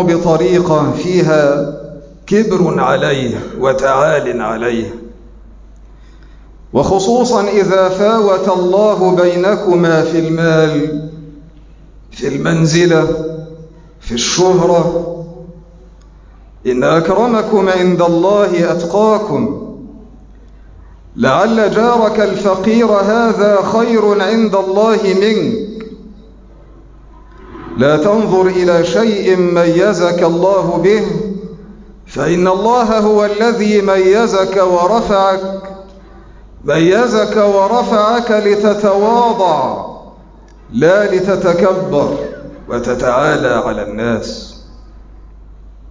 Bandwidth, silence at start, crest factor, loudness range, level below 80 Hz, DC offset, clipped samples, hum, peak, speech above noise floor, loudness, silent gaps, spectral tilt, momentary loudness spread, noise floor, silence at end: 7.6 kHz; 0 s; 12 dB; 5 LU; -40 dBFS; under 0.1%; under 0.1%; none; -2 dBFS; 27 dB; -12 LUFS; none; -6 dB/octave; 12 LU; -38 dBFS; 0 s